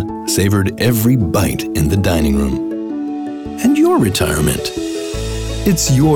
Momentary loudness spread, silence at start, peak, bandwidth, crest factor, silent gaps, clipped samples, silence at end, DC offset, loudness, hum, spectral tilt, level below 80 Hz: 10 LU; 0 s; -4 dBFS; 19 kHz; 12 dB; none; under 0.1%; 0 s; under 0.1%; -16 LUFS; none; -5.5 dB/octave; -30 dBFS